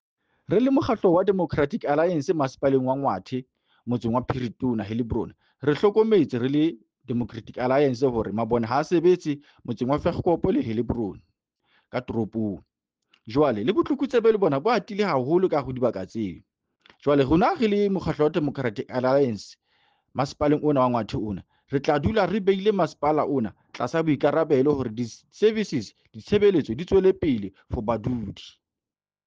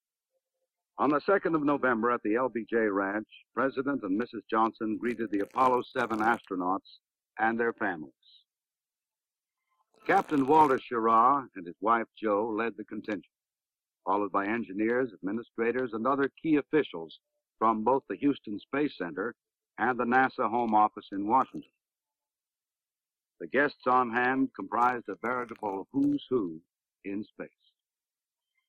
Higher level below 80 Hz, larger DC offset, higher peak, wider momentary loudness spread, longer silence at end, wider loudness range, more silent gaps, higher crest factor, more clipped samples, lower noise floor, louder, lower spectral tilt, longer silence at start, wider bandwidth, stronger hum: first, -50 dBFS vs -74 dBFS; neither; about the same, -8 dBFS vs -10 dBFS; about the same, 11 LU vs 13 LU; second, 0.75 s vs 1.2 s; about the same, 4 LU vs 6 LU; neither; about the same, 16 dB vs 20 dB; neither; about the same, under -90 dBFS vs under -90 dBFS; first, -24 LUFS vs -29 LUFS; about the same, -7.5 dB/octave vs -7 dB/octave; second, 0.5 s vs 0.95 s; second, 7.6 kHz vs 10.5 kHz; neither